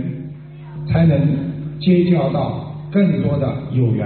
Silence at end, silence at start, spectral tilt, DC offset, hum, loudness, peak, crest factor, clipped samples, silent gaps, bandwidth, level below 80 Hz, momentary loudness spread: 0 s; 0 s; -8.5 dB/octave; under 0.1%; none; -18 LUFS; -4 dBFS; 12 dB; under 0.1%; none; 4.5 kHz; -42 dBFS; 17 LU